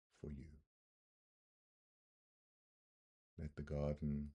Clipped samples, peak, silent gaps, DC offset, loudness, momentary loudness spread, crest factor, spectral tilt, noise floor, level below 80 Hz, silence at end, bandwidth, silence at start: under 0.1%; -28 dBFS; 0.66-3.37 s; under 0.1%; -47 LUFS; 18 LU; 22 dB; -9.5 dB/octave; under -90 dBFS; -60 dBFS; 0 s; 7.8 kHz; 0.25 s